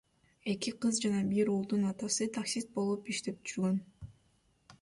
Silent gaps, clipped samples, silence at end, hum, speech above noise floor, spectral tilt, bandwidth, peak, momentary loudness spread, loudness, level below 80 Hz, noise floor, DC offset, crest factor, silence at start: none; under 0.1%; 0.05 s; none; 38 dB; -4.5 dB/octave; 11.5 kHz; -18 dBFS; 9 LU; -34 LUFS; -68 dBFS; -71 dBFS; under 0.1%; 16 dB; 0.45 s